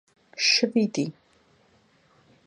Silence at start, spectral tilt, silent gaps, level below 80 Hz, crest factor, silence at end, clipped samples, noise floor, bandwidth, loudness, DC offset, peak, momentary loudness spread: 0.35 s; -3 dB/octave; none; -76 dBFS; 20 dB; 1.35 s; under 0.1%; -62 dBFS; 10.5 kHz; -23 LUFS; under 0.1%; -8 dBFS; 13 LU